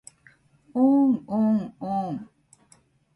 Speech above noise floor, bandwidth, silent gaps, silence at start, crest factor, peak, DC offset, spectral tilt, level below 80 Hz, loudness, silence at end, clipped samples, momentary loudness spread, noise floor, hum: 38 dB; 11 kHz; none; 0.75 s; 16 dB; -10 dBFS; under 0.1%; -8.5 dB/octave; -68 dBFS; -24 LUFS; 0.9 s; under 0.1%; 14 LU; -60 dBFS; none